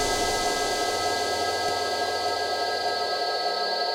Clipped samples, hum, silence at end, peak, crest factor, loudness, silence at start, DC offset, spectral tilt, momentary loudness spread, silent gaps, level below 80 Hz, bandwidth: under 0.1%; none; 0 s; -14 dBFS; 14 dB; -25 LUFS; 0 s; under 0.1%; -1.5 dB/octave; 2 LU; none; -48 dBFS; over 20 kHz